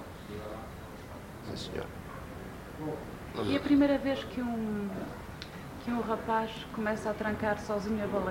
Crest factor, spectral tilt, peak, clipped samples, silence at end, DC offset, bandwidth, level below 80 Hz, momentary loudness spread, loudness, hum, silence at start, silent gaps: 18 dB; -6 dB/octave; -16 dBFS; under 0.1%; 0 s; under 0.1%; 16 kHz; -52 dBFS; 16 LU; -34 LUFS; none; 0 s; none